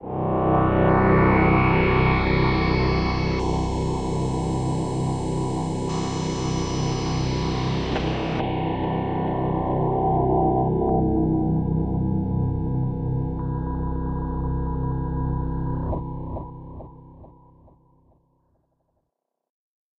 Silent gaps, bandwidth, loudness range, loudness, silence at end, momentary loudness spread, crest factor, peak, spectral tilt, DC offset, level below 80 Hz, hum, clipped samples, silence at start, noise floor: none; 9.6 kHz; 10 LU; -23 LUFS; 2.75 s; 9 LU; 18 dB; -6 dBFS; -7 dB/octave; under 0.1%; -32 dBFS; none; under 0.1%; 0 s; -80 dBFS